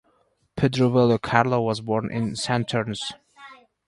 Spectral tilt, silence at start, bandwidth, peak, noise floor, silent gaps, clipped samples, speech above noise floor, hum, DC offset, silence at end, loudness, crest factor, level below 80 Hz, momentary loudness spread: -6 dB/octave; 0.55 s; 11.5 kHz; -2 dBFS; -66 dBFS; none; under 0.1%; 43 dB; none; under 0.1%; 0.35 s; -23 LUFS; 22 dB; -54 dBFS; 12 LU